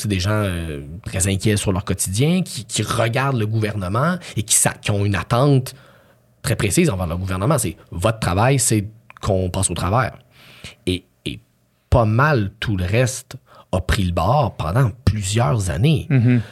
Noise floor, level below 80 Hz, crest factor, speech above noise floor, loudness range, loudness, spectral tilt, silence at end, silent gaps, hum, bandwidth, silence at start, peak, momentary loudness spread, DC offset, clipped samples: -60 dBFS; -38 dBFS; 18 dB; 42 dB; 2 LU; -19 LUFS; -5 dB/octave; 0 s; none; none; 15 kHz; 0 s; -2 dBFS; 12 LU; under 0.1%; under 0.1%